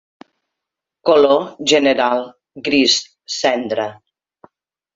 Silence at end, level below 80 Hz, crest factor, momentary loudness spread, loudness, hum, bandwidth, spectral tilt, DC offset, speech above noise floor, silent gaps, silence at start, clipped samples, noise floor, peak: 1 s; -60 dBFS; 18 dB; 13 LU; -16 LUFS; none; 7.8 kHz; -2.5 dB/octave; under 0.1%; 68 dB; none; 1.05 s; under 0.1%; -83 dBFS; 0 dBFS